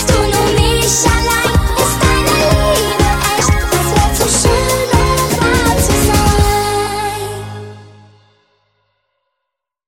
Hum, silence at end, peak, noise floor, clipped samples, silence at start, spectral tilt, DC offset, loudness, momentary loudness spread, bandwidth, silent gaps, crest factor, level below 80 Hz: none; 2 s; 0 dBFS; -77 dBFS; under 0.1%; 0 s; -4 dB/octave; 0.6%; -12 LUFS; 7 LU; 17.5 kHz; none; 14 dB; -20 dBFS